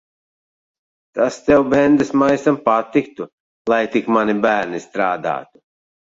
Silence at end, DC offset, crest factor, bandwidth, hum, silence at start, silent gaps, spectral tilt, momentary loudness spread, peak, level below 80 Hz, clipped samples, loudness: 0.7 s; under 0.1%; 16 dB; 7.8 kHz; none; 1.15 s; 3.33-3.65 s; -6 dB/octave; 14 LU; -2 dBFS; -52 dBFS; under 0.1%; -17 LUFS